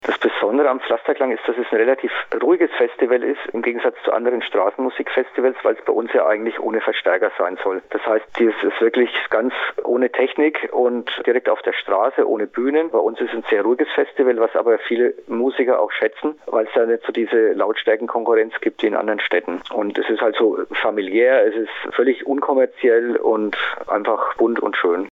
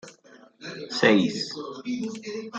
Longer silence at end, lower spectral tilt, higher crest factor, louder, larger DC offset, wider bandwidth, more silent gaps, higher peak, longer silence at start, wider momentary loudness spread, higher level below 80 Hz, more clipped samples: about the same, 0 s vs 0 s; first, -6 dB/octave vs -4.5 dB/octave; second, 12 dB vs 24 dB; first, -19 LUFS vs -25 LUFS; neither; second, 4.3 kHz vs 9.2 kHz; neither; about the same, -6 dBFS vs -4 dBFS; about the same, 0.05 s vs 0.05 s; second, 5 LU vs 19 LU; about the same, -70 dBFS vs -70 dBFS; neither